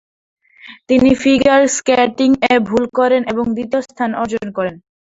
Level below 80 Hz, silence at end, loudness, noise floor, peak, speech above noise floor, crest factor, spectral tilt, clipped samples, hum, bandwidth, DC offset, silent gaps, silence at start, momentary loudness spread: -46 dBFS; 0.25 s; -15 LUFS; -41 dBFS; -2 dBFS; 27 dB; 14 dB; -4 dB/octave; under 0.1%; none; 8 kHz; under 0.1%; none; 0.65 s; 9 LU